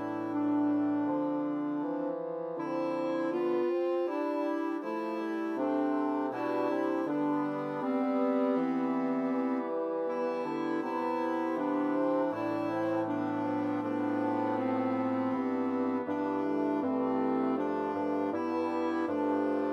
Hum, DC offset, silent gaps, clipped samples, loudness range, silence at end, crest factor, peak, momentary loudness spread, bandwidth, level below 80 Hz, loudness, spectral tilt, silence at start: none; under 0.1%; none; under 0.1%; 1 LU; 0 s; 12 dB; -18 dBFS; 4 LU; 6.6 kHz; -86 dBFS; -32 LUFS; -8 dB/octave; 0 s